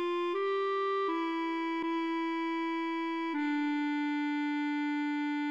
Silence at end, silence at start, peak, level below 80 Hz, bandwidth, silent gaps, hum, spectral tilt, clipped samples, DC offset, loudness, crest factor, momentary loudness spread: 0 s; 0 s; -22 dBFS; -88 dBFS; 7.6 kHz; none; none; -3.5 dB/octave; under 0.1%; under 0.1%; -33 LUFS; 10 dB; 2 LU